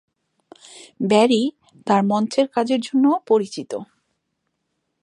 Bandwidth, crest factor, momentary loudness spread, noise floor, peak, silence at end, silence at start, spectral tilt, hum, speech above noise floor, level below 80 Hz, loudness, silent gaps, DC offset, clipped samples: 11 kHz; 20 dB; 14 LU; -75 dBFS; -2 dBFS; 1.2 s; 0.75 s; -5.5 dB/octave; none; 56 dB; -74 dBFS; -19 LUFS; none; under 0.1%; under 0.1%